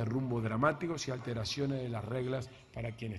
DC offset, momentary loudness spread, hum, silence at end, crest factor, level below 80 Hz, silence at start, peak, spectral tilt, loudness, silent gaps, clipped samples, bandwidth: under 0.1%; 10 LU; none; 0 s; 20 dB; -60 dBFS; 0 s; -16 dBFS; -6 dB/octave; -36 LUFS; none; under 0.1%; 11.5 kHz